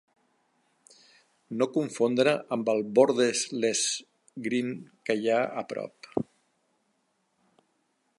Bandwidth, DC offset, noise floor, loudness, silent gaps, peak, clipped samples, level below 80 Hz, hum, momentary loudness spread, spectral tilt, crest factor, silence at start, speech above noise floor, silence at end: 11.5 kHz; under 0.1%; -74 dBFS; -28 LUFS; none; -6 dBFS; under 0.1%; -76 dBFS; none; 14 LU; -3.5 dB/octave; 22 dB; 1.5 s; 47 dB; 1.95 s